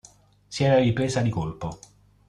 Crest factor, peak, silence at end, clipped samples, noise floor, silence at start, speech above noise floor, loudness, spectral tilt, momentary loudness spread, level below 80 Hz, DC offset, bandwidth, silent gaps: 18 dB; -8 dBFS; 0.5 s; under 0.1%; -54 dBFS; 0.5 s; 31 dB; -23 LUFS; -6.5 dB/octave; 16 LU; -50 dBFS; under 0.1%; 11 kHz; none